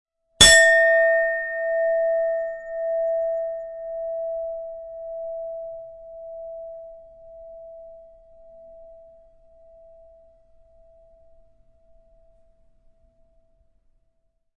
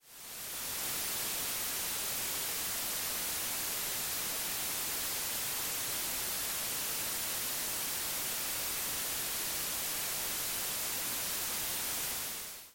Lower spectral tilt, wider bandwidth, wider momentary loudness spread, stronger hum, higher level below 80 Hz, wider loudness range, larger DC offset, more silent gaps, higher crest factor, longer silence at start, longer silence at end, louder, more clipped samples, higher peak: about the same, -0.5 dB/octave vs 0 dB/octave; second, 11.5 kHz vs 17 kHz; first, 28 LU vs 0 LU; neither; first, -50 dBFS vs -62 dBFS; first, 28 LU vs 0 LU; neither; neither; first, 24 dB vs 12 dB; first, 0.4 s vs 0.05 s; first, 5.6 s vs 0 s; first, -19 LUFS vs -33 LUFS; neither; first, -2 dBFS vs -24 dBFS